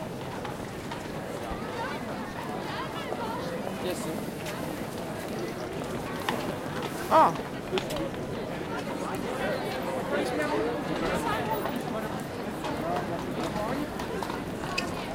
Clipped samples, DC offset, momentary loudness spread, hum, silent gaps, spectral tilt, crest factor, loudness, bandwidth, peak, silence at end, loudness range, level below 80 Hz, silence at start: under 0.1%; under 0.1%; 7 LU; none; none; -5 dB/octave; 22 dB; -31 LUFS; 17 kHz; -8 dBFS; 0 s; 5 LU; -52 dBFS; 0 s